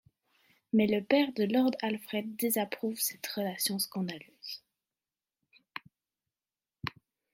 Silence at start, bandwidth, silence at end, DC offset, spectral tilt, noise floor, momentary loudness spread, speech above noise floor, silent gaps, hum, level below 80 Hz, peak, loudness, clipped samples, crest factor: 0.75 s; 16.5 kHz; 0.45 s; under 0.1%; -4 dB/octave; under -90 dBFS; 17 LU; over 59 dB; none; none; -74 dBFS; -12 dBFS; -31 LUFS; under 0.1%; 22 dB